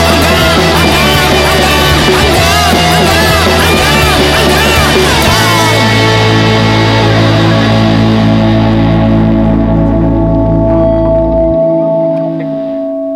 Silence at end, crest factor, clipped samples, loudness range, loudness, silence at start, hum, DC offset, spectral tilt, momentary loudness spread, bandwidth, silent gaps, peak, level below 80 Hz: 0 s; 8 dB; under 0.1%; 3 LU; -8 LUFS; 0 s; none; under 0.1%; -5 dB/octave; 3 LU; 16.5 kHz; none; 0 dBFS; -20 dBFS